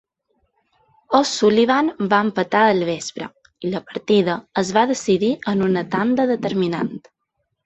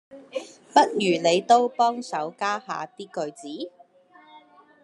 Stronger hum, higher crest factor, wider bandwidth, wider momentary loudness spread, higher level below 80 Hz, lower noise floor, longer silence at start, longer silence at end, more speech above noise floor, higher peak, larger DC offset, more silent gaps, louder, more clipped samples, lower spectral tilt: neither; about the same, 18 dB vs 22 dB; second, 8.2 kHz vs 11 kHz; second, 11 LU vs 17 LU; first, -60 dBFS vs -80 dBFS; first, -74 dBFS vs -54 dBFS; first, 1.1 s vs 0.1 s; first, 0.65 s vs 0.45 s; first, 56 dB vs 31 dB; about the same, -2 dBFS vs -4 dBFS; neither; neither; first, -19 LUFS vs -23 LUFS; neither; about the same, -5 dB/octave vs -4 dB/octave